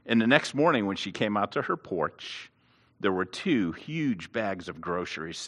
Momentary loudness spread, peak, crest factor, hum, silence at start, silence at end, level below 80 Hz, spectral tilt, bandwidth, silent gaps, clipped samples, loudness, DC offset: 11 LU; -2 dBFS; 26 dB; none; 0.05 s; 0 s; -68 dBFS; -5 dB/octave; 11.5 kHz; none; under 0.1%; -28 LUFS; under 0.1%